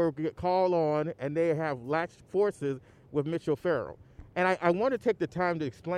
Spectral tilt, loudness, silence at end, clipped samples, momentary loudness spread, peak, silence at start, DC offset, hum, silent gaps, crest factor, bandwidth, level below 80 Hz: -7.5 dB/octave; -30 LUFS; 0 s; under 0.1%; 8 LU; -12 dBFS; 0 s; under 0.1%; none; none; 18 dB; 11 kHz; -60 dBFS